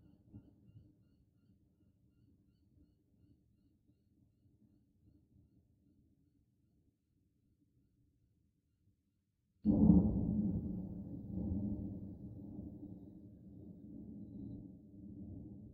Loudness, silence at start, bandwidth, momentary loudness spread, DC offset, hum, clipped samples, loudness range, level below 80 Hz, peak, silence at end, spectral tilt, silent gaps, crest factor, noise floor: -36 LUFS; 0.35 s; 1.3 kHz; 25 LU; under 0.1%; none; under 0.1%; 16 LU; -56 dBFS; -16 dBFS; 0 s; -13.5 dB/octave; none; 26 dB; -82 dBFS